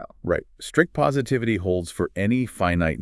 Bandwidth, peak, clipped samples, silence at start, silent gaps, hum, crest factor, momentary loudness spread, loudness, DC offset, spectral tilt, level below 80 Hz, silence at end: 12 kHz; -2 dBFS; under 0.1%; 0 s; none; none; 20 dB; 6 LU; -24 LUFS; under 0.1%; -6.5 dB/octave; -46 dBFS; 0 s